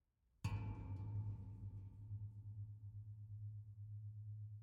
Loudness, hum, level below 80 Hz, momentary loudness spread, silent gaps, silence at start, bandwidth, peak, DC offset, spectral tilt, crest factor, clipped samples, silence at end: -52 LUFS; none; -64 dBFS; 8 LU; none; 0.4 s; 7.4 kHz; -32 dBFS; under 0.1%; -8 dB/octave; 18 dB; under 0.1%; 0 s